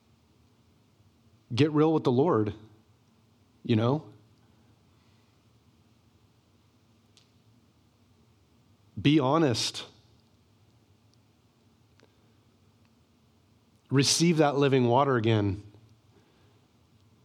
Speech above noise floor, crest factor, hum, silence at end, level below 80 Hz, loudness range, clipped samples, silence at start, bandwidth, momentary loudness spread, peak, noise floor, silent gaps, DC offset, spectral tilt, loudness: 40 dB; 20 dB; none; 1.65 s; -68 dBFS; 9 LU; under 0.1%; 1.5 s; 14.5 kHz; 16 LU; -10 dBFS; -64 dBFS; none; under 0.1%; -5.5 dB/octave; -25 LUFS